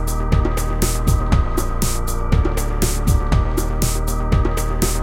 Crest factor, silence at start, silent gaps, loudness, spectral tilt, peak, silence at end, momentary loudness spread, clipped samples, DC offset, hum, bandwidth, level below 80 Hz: 16 dB; 0 s; none; -20 LUFS; -5.5 dB/octave; -2 dBFS; 0 s; 3 LU; under 0.1%; under 0.1%; none; 17 kHz; -18 dBFS